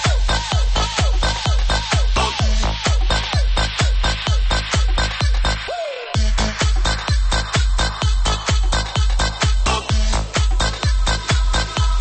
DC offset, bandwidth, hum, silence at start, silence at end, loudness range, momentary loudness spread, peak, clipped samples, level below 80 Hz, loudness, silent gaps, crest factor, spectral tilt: under 0.1%; 8.8 kHz; none; 0 s; 0 s; 1 LU; 2 LU; -4 dBFS; under 0.1%; -18 dBFS; -19 LUFS; none; 12 dB; -3.5 dB/octave